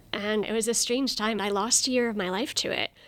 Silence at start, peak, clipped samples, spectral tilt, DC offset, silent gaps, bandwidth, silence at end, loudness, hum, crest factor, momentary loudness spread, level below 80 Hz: 0.15 s; -8 dBFS; under 0.1%; -2 dB/octave; under 0.1%; none; 19 kHz; 0.2 s; -26 LUFS; none; 18 dB; 6 LU; -60 dBFS